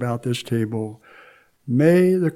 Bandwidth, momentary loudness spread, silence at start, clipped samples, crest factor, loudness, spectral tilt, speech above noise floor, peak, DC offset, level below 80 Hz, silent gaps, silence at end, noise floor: 15 kHz; 16 LU; 0 s; under 0.1%; 18 dB; -20 LUFS; -7.5 dB/octave; 31 dB; -4 dBFS; under 0.1%; -66 dBFS; none; 0 s; -51 dBFS